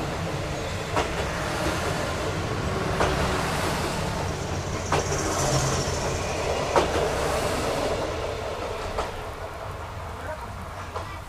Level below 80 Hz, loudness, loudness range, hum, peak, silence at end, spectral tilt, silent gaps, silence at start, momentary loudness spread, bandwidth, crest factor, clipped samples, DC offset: -38 dBFS; -27 LUFS; 5 LU; none; -6 dBFS; 0 s; -4.5 dB/octave; none; 0 s; 11 LU; 15.5 kHz; 22 dB; under 0.1%; under 0.1%